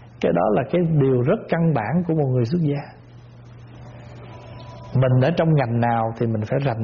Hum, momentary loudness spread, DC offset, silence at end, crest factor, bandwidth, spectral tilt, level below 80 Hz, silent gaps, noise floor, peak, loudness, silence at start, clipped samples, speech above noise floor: none; 22 LU; under 0.1%; 0 s; 14 dB; 6.6 kHz; -8 dB/octave; -50 dBFS; none; -43 dBFS; -8 dBFS; -20 LUFS; 0 s; under 0.1%; 24 dB